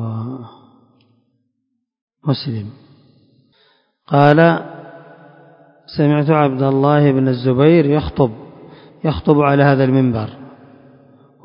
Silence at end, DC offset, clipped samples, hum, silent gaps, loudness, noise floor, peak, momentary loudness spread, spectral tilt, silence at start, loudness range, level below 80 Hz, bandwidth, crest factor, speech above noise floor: 0.95 s; under 0.1%; under 0.1%; none; 2.02-2.08 s; -15 LUFS; -72 dBFS; 0 dBFS; 17 LU; -10.5 dB/octave; 0 s; 14 LU; -44 dBFS; 5.4 kHz; 16 dB; 59 dB